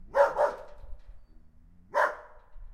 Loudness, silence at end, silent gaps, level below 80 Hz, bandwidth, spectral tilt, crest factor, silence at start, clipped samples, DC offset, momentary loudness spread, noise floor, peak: -28 LUFS; 0 s; none; -50 dBFS; 13 kHz; -4 dB/octave; 22 dB; 0 s; under 0.1%; under 0.1%; 21 LU; -55 dBFS; -10 dBFS